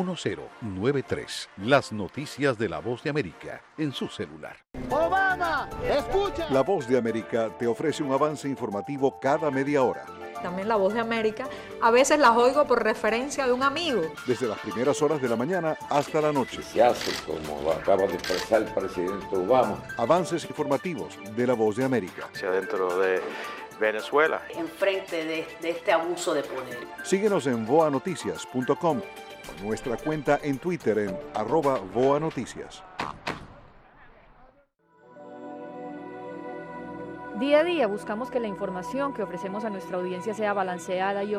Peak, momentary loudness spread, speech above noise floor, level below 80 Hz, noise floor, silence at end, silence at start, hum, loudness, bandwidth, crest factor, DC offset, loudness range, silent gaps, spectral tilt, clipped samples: -8 dBFS; 14 LU; 36 dB; -54 dBFS; -62 dBFS; 0 s; 0 s; none; -26 LUFS; 16 kHz; 18 dB; under 0.1%; 7 LU; none; -5 dB/octave; under 0.1%